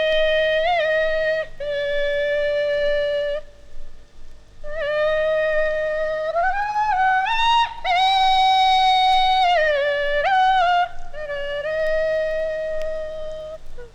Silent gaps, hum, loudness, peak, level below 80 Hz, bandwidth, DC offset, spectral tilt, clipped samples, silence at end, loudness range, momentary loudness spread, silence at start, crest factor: none; 50 Hz at -55 dBFS; -20 LUFS; -8 dBFS; -36 dBFS; 9.6 kHz; under 0.1%; -1.5 dB/octave; under 0.1%; 0.05 s; 7 LU; 12 LU; 0 s; 12 dB